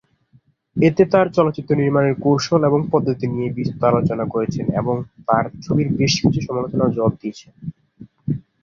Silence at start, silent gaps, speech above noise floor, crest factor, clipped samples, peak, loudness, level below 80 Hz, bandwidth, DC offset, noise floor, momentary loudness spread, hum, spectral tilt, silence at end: 0.75 s; none; 38 dB; 18 dB; under 0.1%; -2 dBFS; -19 LUFS; -48 dBFS; 7.2 kHz; under 0.1%; -57 dBFS; 12 LU; none; -6.5 dB/octave; 0.2 s